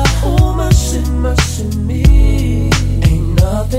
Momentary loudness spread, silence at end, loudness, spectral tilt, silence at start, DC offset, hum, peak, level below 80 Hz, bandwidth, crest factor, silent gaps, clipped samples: 5 LU; 0 s; -13 LUFS; -5.5 dB/octave; 0 s; under 0.1%; none; 0 dBFS; -14 dBFS; 16 kHz; 12 dB; none; 0.2%